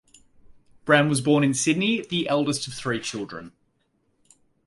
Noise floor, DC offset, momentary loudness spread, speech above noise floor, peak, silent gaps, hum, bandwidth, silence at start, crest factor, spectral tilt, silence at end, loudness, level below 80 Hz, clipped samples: -69 dBFS; under 0.1%; 15 LU; 47 dB; -4 dBFS; none; none; 11.5 kHz; 0.5 s; 22 dB; -4.5 dB/octave; 1.15 s; -23 LUFS; -62 dBFS; under 0.1%